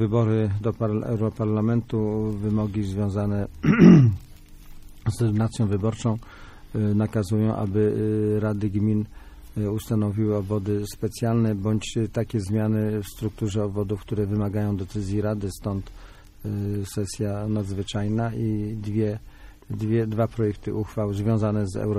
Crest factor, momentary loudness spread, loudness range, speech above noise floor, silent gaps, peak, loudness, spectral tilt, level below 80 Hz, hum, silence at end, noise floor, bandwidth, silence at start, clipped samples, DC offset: 22 dB; 7 LU; 8 LU; 20 dB; none; -2 dBFS; -24 LUFS; -8 dB/octave; -44 dBFS; none; 0 s; -43 dBFS; 14 kHz; 0 s; under 0.1%; under 0.1%